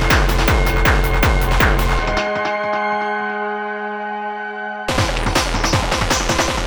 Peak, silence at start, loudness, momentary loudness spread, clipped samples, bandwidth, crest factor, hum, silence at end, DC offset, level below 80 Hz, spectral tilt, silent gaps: 0 dBFS; 0 s; -18 LUFS; 9 LU; under 0.1%; over 20 kHz; 18 dB; none; 0 s; under 0.1%; -22 dBFS; -4 dB/octave; none